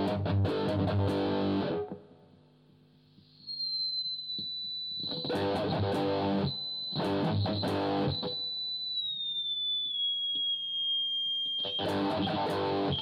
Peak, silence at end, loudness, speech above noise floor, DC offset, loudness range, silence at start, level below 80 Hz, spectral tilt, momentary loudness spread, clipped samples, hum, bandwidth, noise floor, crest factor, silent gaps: -18 dBFS; 0 s; -31 LUFS; 31 dB; under 0.1%; 5 LU; 0 s; -62 dBFS; -6.5 dB/octave; 5 LU; under 0.1%; none; 12.5 kHz; -61 dBFS; 14 dB; none